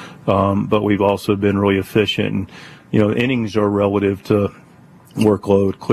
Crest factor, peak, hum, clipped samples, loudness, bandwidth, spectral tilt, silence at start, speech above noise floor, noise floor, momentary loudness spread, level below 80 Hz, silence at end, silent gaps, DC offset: 14 dB; -2 dBFS; none; under 0.1%; -17 LUFS; 14 kHz; -7 dB/octave; 0 s; 28 dB; -45 dBFS; 5 LU; -50 dBFS; 0 s; none; under 0.1%